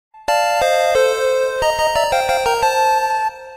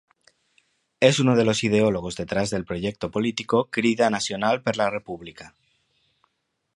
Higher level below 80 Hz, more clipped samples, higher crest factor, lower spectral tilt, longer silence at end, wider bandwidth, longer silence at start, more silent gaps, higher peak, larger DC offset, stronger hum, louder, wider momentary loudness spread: first, -44 dBFS vs -54 dBFS; neither; second, 10 dB vs 22 dB; second, -1 dB/octave vs -5 dB/octave; second, 0 s vs 1.25 s; first, 16 kHz vs 11.5 kHz; second, 0.15 s vs 1 s; neither; second, -6 dBFS vs -2 dBFS; neither; neither; first, -16 LUFS vs -23 LUFS; second, 3 LU vs 10 LU